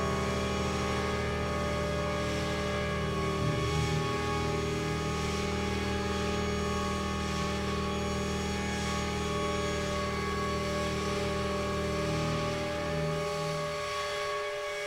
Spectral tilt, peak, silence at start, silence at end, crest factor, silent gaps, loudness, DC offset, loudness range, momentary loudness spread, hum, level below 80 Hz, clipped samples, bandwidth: -5 dB/octave; -18 dBFS; 0 s; 0 s; 14 dB; none; -32 LUFS; under 0.1%; 1 LU; 2 LU; none; -42 dBFS; under 0.1%; 16 kHz